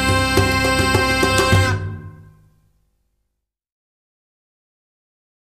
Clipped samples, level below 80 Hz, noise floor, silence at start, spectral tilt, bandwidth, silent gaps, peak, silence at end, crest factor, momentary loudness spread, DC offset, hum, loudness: under 0.1%; -34 dBFS; -77 dBFS; 0 s; -4.5 dB/octave; 15.5 kHz; none; 0 dBFS; 3.2 s; 20 dB; 11 LU; under 0.1%; none; -16 LUFS